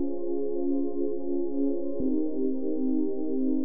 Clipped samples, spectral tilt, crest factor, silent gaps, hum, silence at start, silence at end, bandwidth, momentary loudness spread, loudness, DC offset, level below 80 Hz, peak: under 0.1%; -14.5 dB/octave; 10 dB; none; none; 0 s; 0 s; 1.3 kHz; 3 LU; -30 LUFS; 4%; -60 dBFS; -16 dBFS